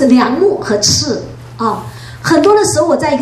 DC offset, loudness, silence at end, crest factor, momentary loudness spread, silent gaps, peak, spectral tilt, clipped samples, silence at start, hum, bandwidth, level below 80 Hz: under 0.1%; -12 LUFS; 0 s; 12 dB; 13 LU; none; 0 dBFS; -4 dB/octave; under 0.1%; 0 s; none; 14 kHz; -44 dBFS